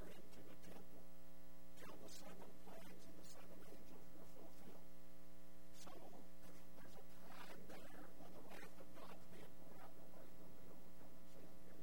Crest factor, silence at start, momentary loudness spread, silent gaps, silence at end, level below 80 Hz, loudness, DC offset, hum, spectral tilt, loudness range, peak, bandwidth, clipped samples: 18 dB; 0 s; 6 LU; none; 0 s; -74 dBFS; -62 LUFS; 0.7%; none; -4.5 dB/octave; 2 LU; -38 dBFS; 16 kHz; under 0.1%